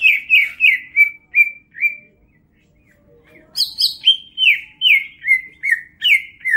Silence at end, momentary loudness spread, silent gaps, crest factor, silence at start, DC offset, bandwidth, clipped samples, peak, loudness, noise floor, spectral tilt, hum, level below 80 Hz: 0 s; 7 LU; none; 16 dB; 0 s; under 0.1%; 16 kHz; under 0.1%; -2 dBFS; -14 LUFS; -56 dBFS; 2.5 dB/octave; none; -62 dBFS